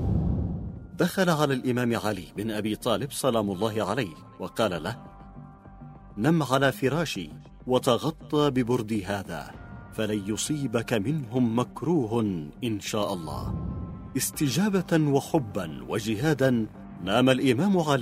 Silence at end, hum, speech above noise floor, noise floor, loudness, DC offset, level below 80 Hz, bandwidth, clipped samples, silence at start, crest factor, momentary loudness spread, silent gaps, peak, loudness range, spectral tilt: 0 s; none; 20 dB; -46 dBFS; -27 LUFS; under 0.1%; -46 dBFS; 16 kHz; under 0.1%; 0 s; 22 dB; 14 LU; none; -6 dBFS; 3 LU; -5.5 dB/octave